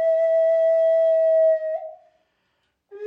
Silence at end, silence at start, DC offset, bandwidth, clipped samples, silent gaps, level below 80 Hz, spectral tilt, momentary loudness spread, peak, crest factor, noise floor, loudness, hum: 0 s; 0 s; under 0.1%; 3.5 kHz; under 0.1%; none; -82 dBFS; -3 dB/octave; 12 LU; -12 dBFS; 8 dB; -72 dBFS; -19 LUFS; none